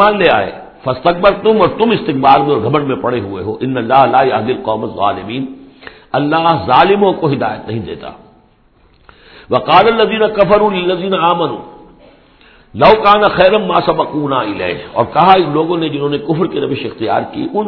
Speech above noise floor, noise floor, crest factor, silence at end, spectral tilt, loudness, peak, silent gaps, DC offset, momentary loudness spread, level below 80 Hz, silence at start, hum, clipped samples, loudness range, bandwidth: 37 dB; -49 dBFS; 12 dB; 0 s; -8.5 dB/octave; -12 LUFS; 0 dBFS; none; under 0.1%; 12 LU; -44 dBFS; 0 s; none; 0.3%; 3 LU; 5.4 kHz